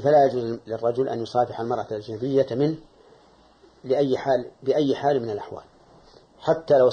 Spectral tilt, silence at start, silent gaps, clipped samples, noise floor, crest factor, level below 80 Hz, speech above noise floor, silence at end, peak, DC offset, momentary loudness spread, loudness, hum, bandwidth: -7.5 dB/octave; 0 s; none; under 0.1%; -55 dBFS; 16 dB; -62 dBFS; 32 dB; 0 s; -8 dBFS; under 0.1%; 12 LU; -24 LUFS; none; 9 kHz